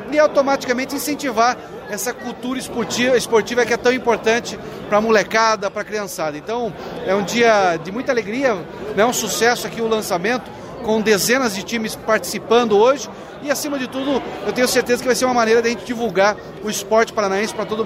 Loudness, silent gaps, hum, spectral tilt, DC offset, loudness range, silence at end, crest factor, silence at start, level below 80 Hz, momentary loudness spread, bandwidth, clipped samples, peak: -18 LUFS; none; none; -3.5 dB/octave; under 0.1%; 2 LU; 0 s; 16 dB; 0 s; -52 dBFS; 10 LU; 16 kHz; under 0.1%; -4 dBFS